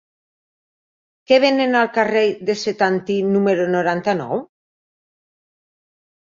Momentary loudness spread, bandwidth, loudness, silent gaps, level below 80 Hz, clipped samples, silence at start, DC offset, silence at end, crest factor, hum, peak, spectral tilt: 7 LU; 7.6 kHz; -18 LUFS; none; -66 dBFS; under 0.1%; 1.3 s; under 0.1%; 1.75 s; 18 dB; none; -2 dBFS; -5.5 dB/octave